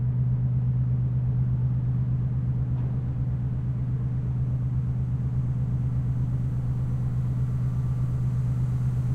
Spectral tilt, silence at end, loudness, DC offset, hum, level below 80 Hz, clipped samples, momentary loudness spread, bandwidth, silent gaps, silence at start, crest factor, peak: -10.5 dB/octave; 0 s; -27 LUFS; under 0.1%; none; -36 dBFS; under 0.1%; 3 LU; 2.4 kHz; none; 0 s; 10 dB; -16 dBFS